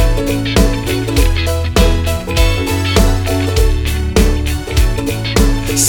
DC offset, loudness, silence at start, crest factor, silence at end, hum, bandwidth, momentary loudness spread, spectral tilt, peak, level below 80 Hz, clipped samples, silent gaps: under 0.1%; -15 LUFS; 0 s; 12 dB; 0 s; none; over 20 kHz; 4 LU; -4.5 dB/octave; 0 dBFS; -16 dBFS; under 0.1%; none